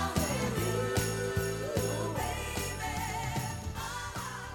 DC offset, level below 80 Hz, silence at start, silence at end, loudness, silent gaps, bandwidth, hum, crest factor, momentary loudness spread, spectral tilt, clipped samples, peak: under 0.1%; -46 dBFS; 0 s; 0 s; -34 LUFS; none; over 20 kHz; none; 18 dB; 7 LU; -4.5 dB/octave; under 0.1%; -16 dBFS